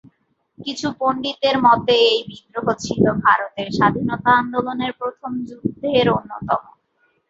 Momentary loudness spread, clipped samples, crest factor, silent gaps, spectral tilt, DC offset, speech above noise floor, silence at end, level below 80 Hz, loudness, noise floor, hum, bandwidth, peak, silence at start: 12 LU; under 0.1%; 18 dB; none; -5 dB/octave; under 0.1%; 46 dB; 0.65 s; -52 dBFS; -19 LUFS; -65 dBFS; none; 7.8 kHz; -2 dBFS; 0.6 s